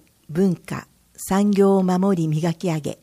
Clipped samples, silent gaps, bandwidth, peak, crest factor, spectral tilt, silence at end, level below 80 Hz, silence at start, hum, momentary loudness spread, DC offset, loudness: under 0.1%; none; 15.5 kHz; -6 dBFS; 14 dB; -7 dB/octave; 0.1 s; -54 dBFS; 0.3 s; none; 14 LU; under 0.1%; -20 LUFS